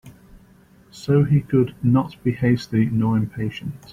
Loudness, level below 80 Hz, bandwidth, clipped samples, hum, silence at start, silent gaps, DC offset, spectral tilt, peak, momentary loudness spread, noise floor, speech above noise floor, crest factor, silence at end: -21 LUFS; -50 dBFS; 11.5 kHz; under 0.1%; none; 0.05 s; none; under 0.1%; -8.5 dB/octave; -6 dBFS; 10 LU; -52 dBFS; 32 dB; 16 dB; 0 s